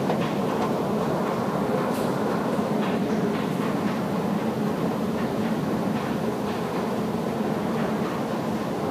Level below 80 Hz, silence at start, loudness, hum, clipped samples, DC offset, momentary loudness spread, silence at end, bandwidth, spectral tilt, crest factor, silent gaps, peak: -56 dBFS; 0 s; -26 LUFS; none; under 0.1%; under 0.1%; 2 LU; 0 s; 15.5 kHz; -6.5 dB/octave; 14 dB; none; -12 dBFS